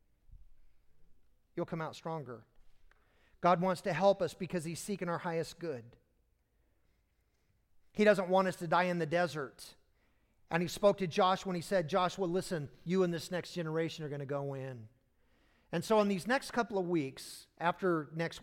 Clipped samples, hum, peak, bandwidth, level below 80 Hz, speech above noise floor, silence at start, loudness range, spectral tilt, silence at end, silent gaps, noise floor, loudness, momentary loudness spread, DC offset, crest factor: under 0.1%; none; -12 dBFS; 16.5 kHz; -66 dBFS; 41 dB; 0.3 s; 6 LU; -5.5 dB/octave; 0 s; none; -75 dBFS; -34 LUFS; 13 LU; under 0.1%; 22 dB